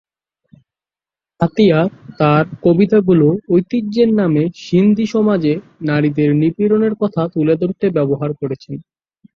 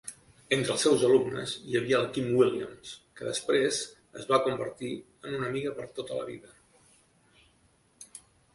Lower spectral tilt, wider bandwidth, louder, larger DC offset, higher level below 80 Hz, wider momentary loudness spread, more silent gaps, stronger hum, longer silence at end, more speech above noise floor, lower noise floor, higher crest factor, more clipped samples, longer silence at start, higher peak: first, -8.5 dB/octave vs -4 dB/octave; second, 7 kHz vs 11.5 kHz; first, -15 LUFS vs -29 LUFS; neither; first, -54 dBFS vs -66 dBFS; second, 8 LU vs 20 LU; neither; neither; first, 0.55 s vs 0.35 s; first, over 76 dB vs 37 dB; first, under -90 dBFS vs -66 dBFS; second, 14 dB vs 20 dB; neither; first, 1.4 s vs 0.05 s; first, 0 dBFS vs -10 dBFS